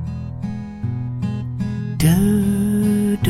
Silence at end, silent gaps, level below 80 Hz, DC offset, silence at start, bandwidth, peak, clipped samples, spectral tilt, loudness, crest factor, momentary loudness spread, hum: 0 s; none; -40 dBFS; under 0.1%; 0 s; 15.5 kHz; -4 dBFS; under 0.1%; -7 dB/octave; -20 LUFS; 14 dB; 12 LU; none